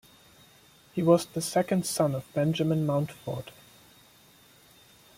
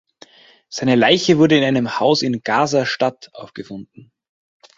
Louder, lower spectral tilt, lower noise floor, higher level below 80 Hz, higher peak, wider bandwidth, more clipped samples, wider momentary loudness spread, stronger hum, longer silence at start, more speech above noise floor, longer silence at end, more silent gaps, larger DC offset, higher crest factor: second, -28 LUFS vs -16 LUFS; about the same, -6 dB/octave vs -5 dB/octave; first, -58 dBFS vs -49 dBFS; second, -66 dBFS vs -58 dBFS; second, -10 dBFS vs 0 dBFS; first, 16.5 kHz vs 7.8 kHz; neither; second, 14 LU vs 21 LU; neither; first, 0.95 s vs 0.7 s; about the same, 31 dB vs 32 dB; first, 1.65 s vs 0.95 s; neither; neither; about the same, 20 dB vs 18 dB